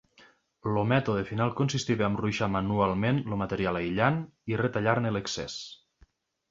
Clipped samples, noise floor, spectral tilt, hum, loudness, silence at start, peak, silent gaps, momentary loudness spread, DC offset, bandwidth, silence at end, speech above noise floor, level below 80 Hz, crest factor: under 0.1%; -63 dBFS; -6 dB/octave; none; -28 LUFS; 0.65 s; -8 dBFS; none; 8 LU; under 0.1%; 7.8 kHz; 0.75 s; 35 dB; -54 dBFS; 20 dB